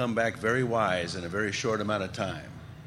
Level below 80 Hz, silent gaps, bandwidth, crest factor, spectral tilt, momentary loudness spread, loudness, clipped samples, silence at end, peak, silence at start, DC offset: -58 dBFS; none; 15.5 kHz; 18 dB; -5 dB/octave; 8 LU; -29 LUFS; under 0.1%; 0 s; -12 dBFS; 0 s; under 0.1%